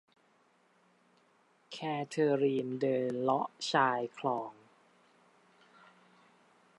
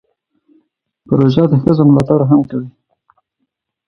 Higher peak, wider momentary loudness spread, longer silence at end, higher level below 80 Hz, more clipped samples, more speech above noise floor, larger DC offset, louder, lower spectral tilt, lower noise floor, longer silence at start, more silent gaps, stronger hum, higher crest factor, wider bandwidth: second, -14 dBFS vs 0 dBFS; second, 9 LU vs 12 LU; first, 2.25 s vs 1.2 s; second, -88 dBFS vs -46 dBFS; neither; second, 37 dB vs 60 dB; neither; second, -33 LUFS vs -12 LUFS; second, -5.5 dB/octave vs -10 dB/octave; about the same, -69 dBFS vs -71 dBFS; first, 1.7 s vs 1.1 s; neither; neither; first, 22 dB vs 14 dB; first, 11 kHz vs 6.4 kHz